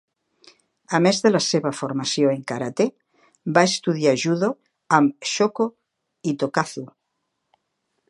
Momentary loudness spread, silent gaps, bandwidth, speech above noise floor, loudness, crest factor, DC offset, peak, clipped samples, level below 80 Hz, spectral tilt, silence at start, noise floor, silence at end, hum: 10 LU; none; 11.5 kHz; 56 dB; -21 LUFS; 22 dB; under 0.1%; 0 dBFS; under 0.1%; -72 dBFS; -4.5 dB/octave; 0.9 s; -76 dBFS; 1.25 s; none